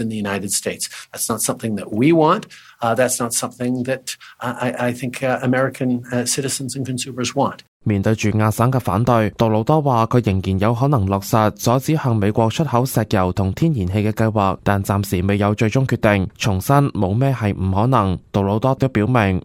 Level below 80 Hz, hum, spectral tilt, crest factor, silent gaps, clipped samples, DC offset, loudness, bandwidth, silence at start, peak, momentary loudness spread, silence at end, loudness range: -46 dBFS; none; -5.5 dB/octave; 16 dB; 7.68-7.80 s; under 0.1%; under 0.1%; -19 LUFS; 16.5 kHz; 0 s; -2 dBFS; 7 LU; 0.05 s; 4 LU